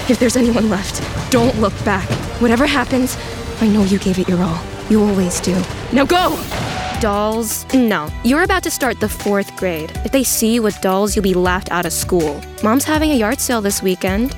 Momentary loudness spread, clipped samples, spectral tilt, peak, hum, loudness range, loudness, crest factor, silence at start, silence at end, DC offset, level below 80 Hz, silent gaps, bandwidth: 7 LU; under 0.1%; -4.5 dB/octave; -2 dBFS; none; 1 LU; -16 LUFS; 14 dB; 0 s; 0 s; under 0.1%; -32 dBFS; none; 19.5 kHz